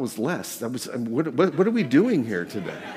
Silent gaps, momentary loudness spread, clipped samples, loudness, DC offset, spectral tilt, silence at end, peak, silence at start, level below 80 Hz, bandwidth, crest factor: none; 11 LU; under 0.1%; -24 LUFS; under 0.1%; -6 dB/octave; 0 s; -6 dBFS; 0 s; -70 dBFS; 16 kHz; 16 dB